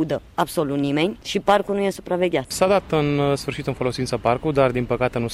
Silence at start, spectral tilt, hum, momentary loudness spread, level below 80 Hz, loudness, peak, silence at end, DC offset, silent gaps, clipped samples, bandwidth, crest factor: 0 s; -5.5 dB/octave; none; 5 LU; -46 dBFS; -22 LUFS; -4 dBFS; 0 s; under 0.1%; none; under 0.1%; 15.5 kHz; 16 dB